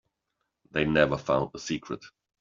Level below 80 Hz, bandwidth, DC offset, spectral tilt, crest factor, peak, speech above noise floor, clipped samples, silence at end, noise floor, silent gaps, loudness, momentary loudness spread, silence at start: -54 dBFS; 7.6 kHz; under 0.1%; -4.5 dB/octave; 22 dB; -6 dBFS; 54 dB; under 0.1%; 0.35 s; -81 dBFS; none; -27 LUFS; 13 LU; 0.75 s